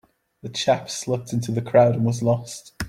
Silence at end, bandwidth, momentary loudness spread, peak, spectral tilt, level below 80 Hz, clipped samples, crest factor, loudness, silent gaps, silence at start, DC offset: 0 s; 15 kHz; 13 LU; -4 dBFS; -5.5 dB/octave; -52 dBFS; under 0.1%; 20 dB; -22 LUFS; none; 0.45 s; under 0.1%